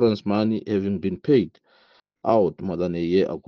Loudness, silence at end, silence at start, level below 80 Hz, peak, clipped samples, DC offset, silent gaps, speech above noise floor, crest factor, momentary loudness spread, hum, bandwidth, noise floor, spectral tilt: -23 LUFS; 0.1 s; 0 s; -58 dBFS; -6 dBFS; under 0.1%; under 0.1%; none; 38 dB; 18 dB; 6 LU; none; 6.6 kHz; -60 dBFS; -9 dB/octave